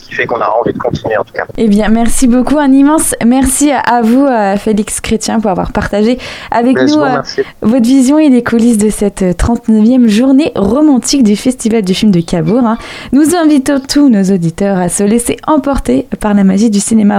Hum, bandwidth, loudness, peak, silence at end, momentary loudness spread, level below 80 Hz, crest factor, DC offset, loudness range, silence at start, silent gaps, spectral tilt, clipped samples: none; 15.5 kHz; -10 LUFS; 0 dBFS; 0 s; 6 LU; -28 dBFS; 8 dB; under 0.1%; 2 LU; 0.1 s; none; -5 dB/octave; under 0.1%